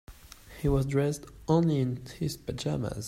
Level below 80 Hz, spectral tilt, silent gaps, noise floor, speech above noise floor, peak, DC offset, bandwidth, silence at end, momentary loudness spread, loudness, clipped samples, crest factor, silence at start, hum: -44 dBFS; -7 dB/octave; none; -50 dBFS; 21 dB; -12 dBFS; under 0.1%; 16 kHz; 0 s; 9 LU; -30 LUFS; under 0.1%; 18 dB; 0.1 s; none